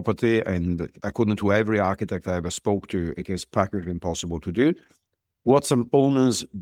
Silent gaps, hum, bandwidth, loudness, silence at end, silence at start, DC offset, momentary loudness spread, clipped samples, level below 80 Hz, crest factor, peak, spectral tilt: none; none; 16.5 kHz; -24 LUFS; 0 s; 0 s; under 0.1%; 9 LU; under 0.1%; -48 dBFS; 18 dB; -6 dBFS; -6 dB/octave